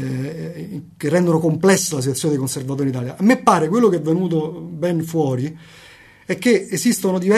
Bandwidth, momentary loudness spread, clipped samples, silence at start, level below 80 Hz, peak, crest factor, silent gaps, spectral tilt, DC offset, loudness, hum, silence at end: 13.5 kHz; 12 LU; under 0.1%; 0 s; -60 dBFS; 0 dBFS; 18 dB; none; -5.5 dB/octave; under 0.1%; -19 LUFS; none; 0 s